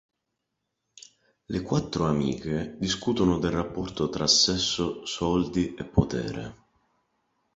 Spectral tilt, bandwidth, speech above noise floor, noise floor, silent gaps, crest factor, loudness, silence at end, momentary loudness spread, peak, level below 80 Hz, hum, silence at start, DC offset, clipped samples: -4.5 dB/octave; 8 kHz; 55 dB; -81 dBFS; none; 22 dB; -26 LUFS; 1 s; 12 LU; -6 dBFS; -46 dBFS; none; 1.5 s; under 0.1%; under 0.1%